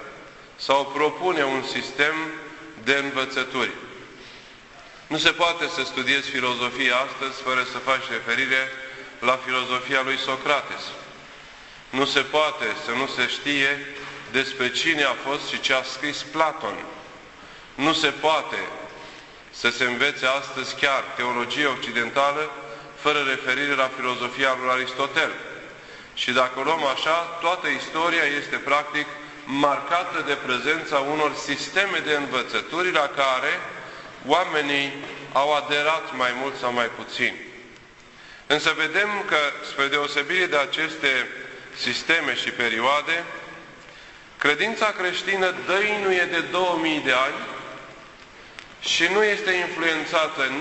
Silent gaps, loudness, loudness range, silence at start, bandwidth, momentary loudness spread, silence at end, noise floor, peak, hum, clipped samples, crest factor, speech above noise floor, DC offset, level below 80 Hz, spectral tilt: none; -23 LUFS; 2 LU; 0 s; 8.4 kHz; 17 LU; 0 s; -47 dBFS; -2 dBFS; none; under 0.1%; 22 dB; 24 dB; under 0.1%; -62 dBFS; -2.5 dB/octave